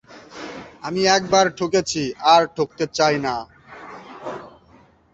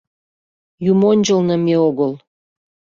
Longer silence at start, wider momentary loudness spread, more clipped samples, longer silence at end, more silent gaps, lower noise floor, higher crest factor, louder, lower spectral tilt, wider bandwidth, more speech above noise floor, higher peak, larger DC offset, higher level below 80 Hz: second, 0.1 s vs 0.8 s; first, 23 LU vs 9 LU; neither; about the same, 0.65 s vs 0.7 s; neither; second, -53 dBFS vs under -90 dBFS; first, 20 dB vs 14 dB; second, -19 LUFS vs -16 LUFS; second, -3.5 dB/octave vs -6.5 dB/octave; first, 8.2 kHz vs 7.4 kHz; second, 34 dB vs over 76 dB; about the same, -2 dBFS vs -4 dBFS; neither; about the same, -56 dBFS vs -60 dBFS